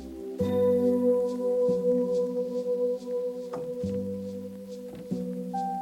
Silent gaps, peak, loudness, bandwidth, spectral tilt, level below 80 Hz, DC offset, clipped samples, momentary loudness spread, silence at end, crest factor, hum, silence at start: none; -14 dBFS; -28 LUFS; 14.5 kHz; -8.5 dB/octave; -62 dBFS; under 0.1%; under 0.1%; 14 LU; 0 s; 14 dB; none; 0 s